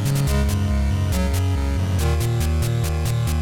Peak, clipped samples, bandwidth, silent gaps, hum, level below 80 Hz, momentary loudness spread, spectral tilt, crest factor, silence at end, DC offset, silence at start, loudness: -10 dBFS; under 0.1%; 17.5 kHz; none; none; -24 dBFS; 2 LU; -6 dB/octave; 10 dB; 0 s; under 0.1%; 0 s; -21 LUFS